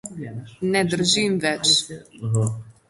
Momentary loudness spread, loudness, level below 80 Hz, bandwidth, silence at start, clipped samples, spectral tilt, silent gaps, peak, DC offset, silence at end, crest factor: 16 LU; -20 LUFS; -58 dBFS; 11.5 kHz; 0.05 s; under 0.1%; -3.5 dB/octave; none; -6 dBFS; under 0.1%; 0.2 s; 18 dB